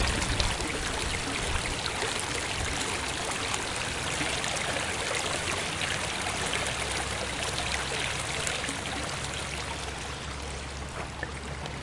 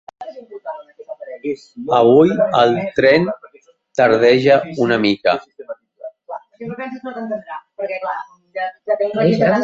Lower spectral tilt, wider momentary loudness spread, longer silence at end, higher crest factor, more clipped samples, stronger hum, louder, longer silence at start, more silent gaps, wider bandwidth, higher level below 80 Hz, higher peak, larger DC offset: second, -2.5 dB/octave vs -7 dB/octave; second, 7 LU vs 22 LU; about the same, 0 s vs 0 s; first, 26 dB vs 16 dB; neither; neither; second, -30 LUFS vs -16 LUFS; second, 0 s vs 0.2 s; neither; first, 11.5 kHz vs 7.6 kHz; first, -42 dBFS vs -58 dBFS; second, -6 dBFS vs -2 dBFS; first, 0.1% vs under 0.1%